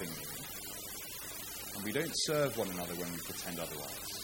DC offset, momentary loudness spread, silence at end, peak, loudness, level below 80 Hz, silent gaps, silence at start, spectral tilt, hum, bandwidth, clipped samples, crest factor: under 0.1%; 9 LU; 0 s; -20 dBFS; -38 LUFS; -62 dBFS; none; 0 s; -3 dB/octave; 50 Hz at -65 dBFS; 17 kHz; under 0.1%; 20 dB